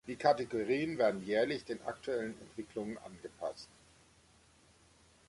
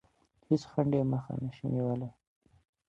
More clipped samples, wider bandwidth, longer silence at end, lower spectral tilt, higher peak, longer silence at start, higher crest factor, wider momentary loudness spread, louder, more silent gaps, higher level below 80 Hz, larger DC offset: neither; first, 11.5 kHz vs 7.8 kHz; first, 1.65 s vs 0.8 s; second, -5.5 dB/octave vs -9 dB/octave; about the same, -14 dBFS vs -14 dBFS; second, 0.05 s vs 0.5 s; about the same, 22 dB vs 20 dB; first, 16 LU vs 9 LU; second, -36 LUFS vs -32 LUFS; neither; second, -70 dBFS vs -64 dBFS; neither